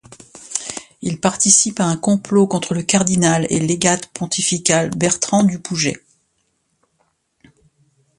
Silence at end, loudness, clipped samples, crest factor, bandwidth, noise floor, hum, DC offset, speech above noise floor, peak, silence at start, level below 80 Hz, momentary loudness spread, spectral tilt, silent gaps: 2.2 s; -17 LUFS; under 0.1%; 18 dB; 11.5 kHz; -67 dBFS; none; under 0.1%; 50 dB; 0 dBFS; 0.35 s; -54 dBFS; 13 LU; -3.5 dB/octave; none